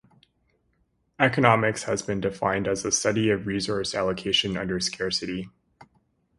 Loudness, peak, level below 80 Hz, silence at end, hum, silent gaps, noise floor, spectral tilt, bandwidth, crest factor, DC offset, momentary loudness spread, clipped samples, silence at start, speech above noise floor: -25 LUFS; 0 dBFS; -54 dBFS; 0.55 s; none; none; -70 dBFS; -3.5 dB/octave; 11.5 kHz; 26 dB; under 0.1%; 8 LU; under 0.1%; 1.2 s; 45 dB